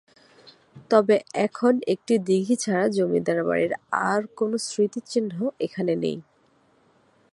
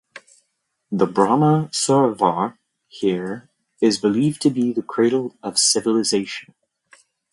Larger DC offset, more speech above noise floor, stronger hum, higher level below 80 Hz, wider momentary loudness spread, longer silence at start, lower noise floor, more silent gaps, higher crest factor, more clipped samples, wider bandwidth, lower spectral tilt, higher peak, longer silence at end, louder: neither; second, 39 dB vs 54 dB; neither; second, -70 dBFS vs -64 dBFS; second, 6 LU vs 11 LU; first, 0.45 s vs 0.15 s; second, -62 dBFS vs -73 dBFS; neither; about the same, 20 dB vs 20 dB; neither; about the same, 11.5 kHz vs 11.5 kHz; about the same, -5.5 dB/octave vs -4.5 dB/octave; about the same, -4 dBFS vs -2 dBFS; first, 1.1 s vs 0.9 s; second, -24 LUFS vs -19 LUFS